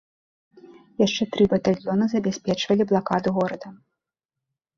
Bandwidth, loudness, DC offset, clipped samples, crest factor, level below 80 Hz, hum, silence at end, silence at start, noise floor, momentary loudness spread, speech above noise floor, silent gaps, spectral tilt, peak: 7.4 kHz; -23 LUFS; under 0.1%; under 0.1%; 18 dB; -58 dBFS; none; 1 s; 0.7 s; -86 dBFS; 8 LU; 64 dB; none; -6 dB/octave; -6 dBFS